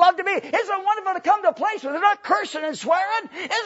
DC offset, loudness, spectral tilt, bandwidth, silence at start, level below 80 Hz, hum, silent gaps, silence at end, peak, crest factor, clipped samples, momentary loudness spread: under 0.1%; -22 LUFS; -2 dB/octave; 8 kHz; 0 s; -74 dBFS; none; none; 0 s; -2 dBFS; 18 dB; under 0.1%; 6 LU